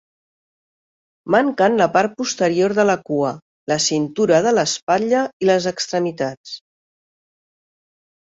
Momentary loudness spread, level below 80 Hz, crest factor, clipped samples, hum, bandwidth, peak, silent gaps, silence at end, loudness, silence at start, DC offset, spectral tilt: 11 LU; -62 dBFS; 18 dB; under 0.1%; none; 8 kHz; -2 dBFS; 3.42-3.67 s, 4.82-4.87 s, 5.33-5.40 s, 6.37-6.44 s; 1.7 s; -18 LUFS; 1.25 s; under 0.1%; -4 dB/octave